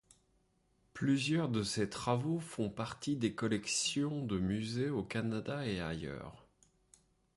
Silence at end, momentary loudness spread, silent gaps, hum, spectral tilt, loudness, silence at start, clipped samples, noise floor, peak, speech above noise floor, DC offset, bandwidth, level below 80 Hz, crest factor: 0.95 s; 8 LU; none; none; -5 dB/octave; -36 LUFS; 0.95 s; under 0.1%; -74 dBFS; -18 dBFS; 39 dB; under 0.1%; 11.5 kHz; -62 dBFS; 18 dB